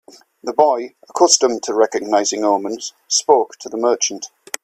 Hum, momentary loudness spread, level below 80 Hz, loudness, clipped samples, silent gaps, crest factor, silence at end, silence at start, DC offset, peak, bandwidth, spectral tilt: none; 15 LU; -68 dBFS; -17 LUFS; under 0.1%; none; 18 dB; 0.35 s; 0.45 s; under 0.1%; 0 dBFS; 15 kHz; -1 dB/octave